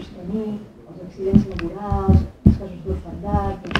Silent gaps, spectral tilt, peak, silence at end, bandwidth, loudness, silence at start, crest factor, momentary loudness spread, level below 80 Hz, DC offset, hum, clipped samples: none; -8.5 dB/octave; 0 dBFS; 0 s; 6.6 kHz; -21 LUFS; 0 s; 20 dB; 15 LU; -30 dBFS; under 0.1%; none; under 0.1%